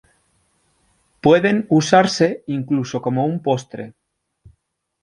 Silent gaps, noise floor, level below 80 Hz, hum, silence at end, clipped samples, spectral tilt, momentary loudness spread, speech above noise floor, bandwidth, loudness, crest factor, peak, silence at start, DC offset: none; -70 dBFS; -60 dBFS; none; 1.15 s; under 0.1%; -5.5 dB/octave; 12 LU; 52 dB; 11 kHz; -18 LUFS; 18 dB; -2 dBFS; 1.25 s; under 0.1%